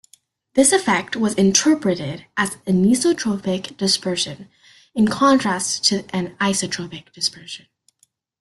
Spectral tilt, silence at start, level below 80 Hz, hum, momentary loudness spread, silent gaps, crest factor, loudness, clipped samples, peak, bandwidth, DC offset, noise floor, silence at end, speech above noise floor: -3.5 dB/octave; 0.55 s; -58 dBFS; none; 12 LU; none; 20 dB; -19 LUFS; under 0.1%; 0 dBFS; 12.5 kHz; under 0.1%; -63 dBFS; 0.85 s; 44 dB